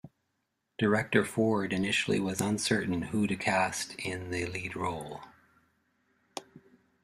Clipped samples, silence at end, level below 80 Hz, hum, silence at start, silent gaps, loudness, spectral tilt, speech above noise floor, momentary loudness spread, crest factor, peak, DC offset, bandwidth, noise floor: under 0.1%; 0.45 s; -64 dBFS; none; 0.05 s; none; -30 LUFS; -4.5 dB/octave; 50 dB; 17 LU; 22 dB; -10 dBFS; under 0.1%; 15 kHz; -80 dBFS